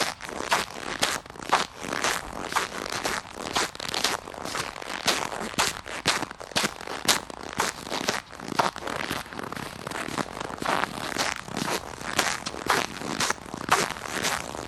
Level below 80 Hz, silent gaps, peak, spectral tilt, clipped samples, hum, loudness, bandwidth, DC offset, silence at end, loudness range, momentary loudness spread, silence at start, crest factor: -54 dBFS; none; 0 dBFS; -2 dB/octave; under 0.1%; none; -28 LUFS; 19 kHz; under 0.1%; 0 s; 3 LU; 7 LU; 0 s; 30 dB